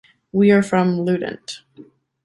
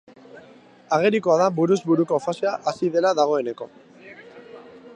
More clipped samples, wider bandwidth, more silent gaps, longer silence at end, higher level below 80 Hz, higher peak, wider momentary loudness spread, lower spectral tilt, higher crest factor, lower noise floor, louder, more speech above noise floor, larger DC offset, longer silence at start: neither; first, 11.5 kHz vs 9.8 kHz; neither; first, 0.4 s vs 0 s; first, -60 dBFS vs -72 dBFS; first, -2 dBFS vs -6 dBFS; about the same, 19 LU vs 20 LU; about the same, -7 dB/octave vs -6 dB/octave; about the same, 18 dB vs 18 dB; about the same, -47 dBFS vs -49 dBFS; first, -18 LUFS vs -21 LUFS; about the same, 29 dB vs 28 dB; neither; about the same, 0.35 s vs 0.35 s